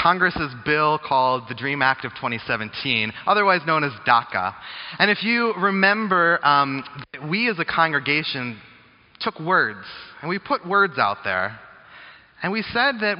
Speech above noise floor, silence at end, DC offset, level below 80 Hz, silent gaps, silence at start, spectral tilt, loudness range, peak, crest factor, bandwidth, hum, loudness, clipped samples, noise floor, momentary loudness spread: 27 dB; 0 s; under 0.1%; -58 dBFS; none; 0 s; -2 dB/octave; 4 LU; -2 dBFS; 20 dB; 5.6 kHz; none; -21 LUFS; under 0.1%; -49 dBFS; 11 LU